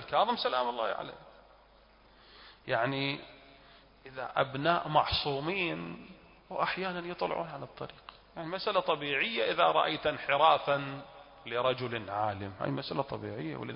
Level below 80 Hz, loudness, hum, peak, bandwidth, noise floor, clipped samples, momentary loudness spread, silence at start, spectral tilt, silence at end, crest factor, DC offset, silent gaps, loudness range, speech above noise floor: -60 dBFS; -31 LUFS; none; -10 dBFS; 5.4 kHz; -61 dBFS; under 0.1%; 18 LU; 0 s; -2.5 dB/octave; 0 s; 22 dB; under 0.1%; none; 7 LU; 29 dB